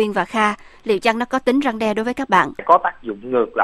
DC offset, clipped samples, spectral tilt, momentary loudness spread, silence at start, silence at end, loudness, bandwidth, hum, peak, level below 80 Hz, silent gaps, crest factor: under 0.1%; under 0.1%; -5 dB/octave; 7 LU; 0 s; 0 s; -19 LUFS; 13.5 kHz; none; 0 dBFS; -52 dBFS; none; 18 dB